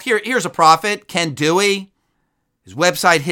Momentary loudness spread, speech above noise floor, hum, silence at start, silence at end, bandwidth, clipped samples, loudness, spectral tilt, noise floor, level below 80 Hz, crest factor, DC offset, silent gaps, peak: 8 LU; 53 dB; none; 0 s; 0 s; 19 kHz; under 0.1%; -16 LUFS; -3 dB/octave; -69 dBFS; -62 dBFS; 18 dB; under 0.1%; none; 0 dBFS